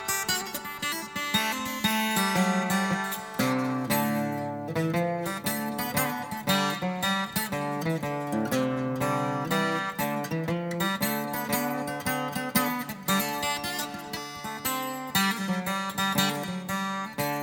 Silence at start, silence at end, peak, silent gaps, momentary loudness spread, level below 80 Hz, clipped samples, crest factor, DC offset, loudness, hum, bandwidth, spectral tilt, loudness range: 0 s; 0 s; -10 dBFS; none; 6 LU; -60 dBFS; under 0.1%; 18 dB; under 0.1%; -28 LUFS; none; over 20 kHz; -4 dB/octave; 2 LU